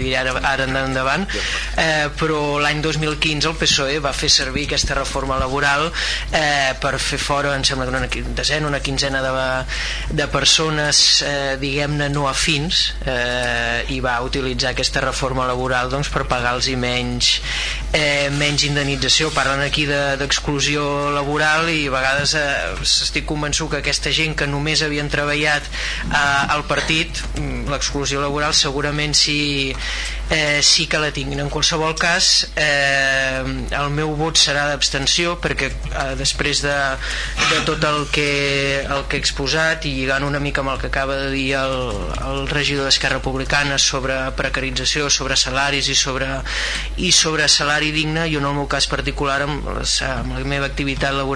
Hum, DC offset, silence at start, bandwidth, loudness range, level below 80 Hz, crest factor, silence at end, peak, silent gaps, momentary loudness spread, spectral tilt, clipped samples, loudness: none; under 0.1%; 0 s; 11 kHz; 3 LU; -30 dBFS; 18 dB; 0 s; -2 dBFS; none; 7 LU; -2.5 dB/octave; under 0.1%; -18 LUFS